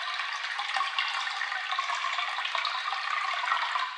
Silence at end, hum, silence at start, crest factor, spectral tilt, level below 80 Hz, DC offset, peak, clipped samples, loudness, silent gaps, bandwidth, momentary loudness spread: 0 s; none; 0 s; 18 dB; 6 dB/octave; under -90 dBFS; under 0.1%; -12 dBFS; under 0.1%; -29 LUFS; none; 11.5 kHz; 3 LU